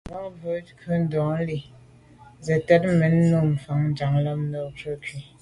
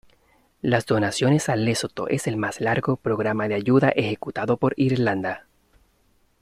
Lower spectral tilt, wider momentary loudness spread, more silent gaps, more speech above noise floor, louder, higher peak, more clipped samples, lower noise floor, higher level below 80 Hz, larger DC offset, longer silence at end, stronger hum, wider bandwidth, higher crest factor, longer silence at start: first, -8.5 dB/octave vs -6 dB/octave; first, 15 LU vs 8 LU; neither; second, 27 dB vs 41 dB; about the same, -24 LUFS vs -23 LUFS; about the same, -6 dBFS vs -6 dBFS; neither; second, -50 dBFS vs -63 dBFS; first, -52 dBFS vs -58 dBFS; neither; second, 0.2 s vs 1 s; neither; second, 11 kHz vs 14.5 kHz; about the same, 18 dB vs 18 dB; second, 0.05 s vs 0.65 s